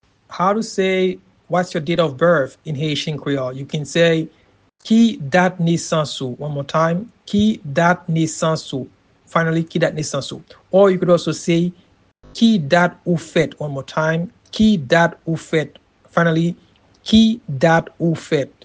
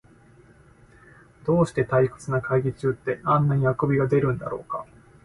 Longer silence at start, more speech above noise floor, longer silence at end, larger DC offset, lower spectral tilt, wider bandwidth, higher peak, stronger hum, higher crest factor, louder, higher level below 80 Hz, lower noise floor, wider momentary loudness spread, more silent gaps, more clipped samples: second, 0.3 s vs 1.45 s; about the same, 31 dB vs 30 dB; second, 0.15 s vs 0.4 s; neither; second, -6 dB/octave vs -8.5 dB/octave; second, 9.6 kHz vs 11.5 kHz; first, 0 dBFS vs -8 dBFS; neither; about the same, 18 dB vs 16 dB; first, -18 LUFS vs -24 LUFS; about the same, -50 dBFS vs -52 dBFS; second, -49 dBFS vs -53 dBFS; about the same, 11 LU vs 10 LU; neither; neither